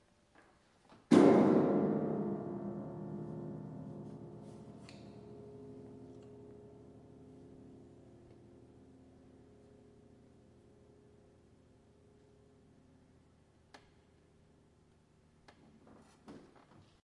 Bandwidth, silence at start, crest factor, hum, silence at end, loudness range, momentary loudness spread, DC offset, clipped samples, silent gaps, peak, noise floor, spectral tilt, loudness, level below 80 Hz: 11 kHz; 1.1 s; 26 dB; none; 0.7 s; 28 LU; 30 LU; under 0.1%; under 0.1%; none; -12 dBFS; -68 dBFS; -7.5 dB/octave; -32 LUFS; -74 dBFS